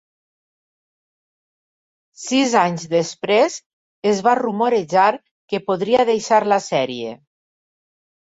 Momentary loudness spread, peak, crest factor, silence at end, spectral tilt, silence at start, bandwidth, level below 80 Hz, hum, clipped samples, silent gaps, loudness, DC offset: 11 LU; -2 dBFS; 18 dB; 1.1 s; -4 dB/octave; 2.2 s; 8 kHz; -66 dBFS; none; under 0.1%; 3.66-4.02 s, 5.31-5.48 s; -18 LUFS; under 0.1%